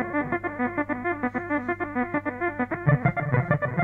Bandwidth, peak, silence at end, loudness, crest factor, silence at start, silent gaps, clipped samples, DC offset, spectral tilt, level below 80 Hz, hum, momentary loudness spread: 4 kHz; -6 dBFS; 0 s; -26 LUFS; 20 dB; 0 s; none; under 0.1%; under 0.1%; -10.5 dB/octave; -50 dBFS; none; 5 LU